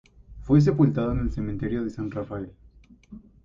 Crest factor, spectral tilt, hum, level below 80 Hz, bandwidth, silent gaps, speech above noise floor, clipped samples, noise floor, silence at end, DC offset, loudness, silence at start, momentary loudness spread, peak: 18 dB; -9.5 dB/octave; none; -40 dBFS; 7.4 kHz; none; 28 dB; under 0.1%; -52 dBFS; 0.25 s; under 0.1%; -25 LUFS; 0.3 s; 16 LU; -8 dBFS